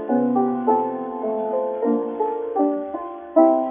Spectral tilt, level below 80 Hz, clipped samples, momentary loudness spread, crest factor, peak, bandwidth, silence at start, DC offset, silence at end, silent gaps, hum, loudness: -7.5 dB/octave; -68 dBFS; under 0.1%; 10 LU; 18 dB; -2 dBFS; 3.6 kHz; 0 s; under 0.1%; 0 s; none; none; -22 LUFS